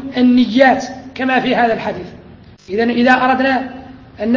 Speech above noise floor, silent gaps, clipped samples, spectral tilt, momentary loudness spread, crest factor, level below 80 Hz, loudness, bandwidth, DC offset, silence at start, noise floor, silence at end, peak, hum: 27 dB; none; under 0.1%; -5.5 dB/octave; 17 LU; 14 dB; -48 dBFS; -14 LUFS; 7 kHz; under 0.1%; 0 s; -40 dBFS; 0 s; 0 dBFS; none